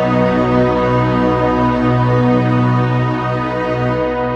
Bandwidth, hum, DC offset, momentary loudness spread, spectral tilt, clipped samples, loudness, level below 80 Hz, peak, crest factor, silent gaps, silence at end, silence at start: 7 kHz; none; under 0.1%; 4 LU; -8.5 dB/octave; under 0.1%; -15 LUFS; -34 dBFS; -2 dBFS; 12 dB; none; 0 s; 0 s